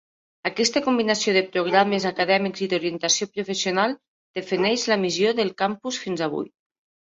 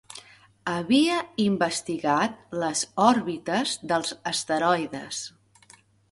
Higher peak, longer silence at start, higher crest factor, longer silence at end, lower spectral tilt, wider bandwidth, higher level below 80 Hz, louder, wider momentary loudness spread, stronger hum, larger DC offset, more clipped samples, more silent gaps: about the same, -2 dBFS vs -4 dBFS; first, 0.45 s vs 0.1 s; about the same, 20 dB vs 22 dB; second, 0.55 s vs 0.8 s; about the same, -3 dB/octave vs -3.5 dB/octave; second, 8.2 kHz vs 11.5 kHz; about the same, -68 dBFS vs -66 dBFS; about the same, -23 LUFS vs -25 LUFS; second, 9 LU vs 13 LU; neither; neither; neither; first, 4.08-4.34 s vs none